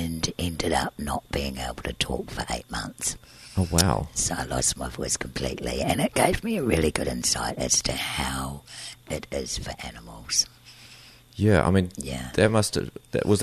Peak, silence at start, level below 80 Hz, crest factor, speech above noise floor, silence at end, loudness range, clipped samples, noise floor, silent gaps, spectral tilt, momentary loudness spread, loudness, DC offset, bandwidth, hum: -2 dBFS; 0 s; -40 dBFS; 24 dB; 24 dB; 0 s; 5 LU; under 0.1%; -50 dBFS; none; -4 dB/octave; 13 LU; -26 LUFS; under 0.1%; 13.5 kHz; none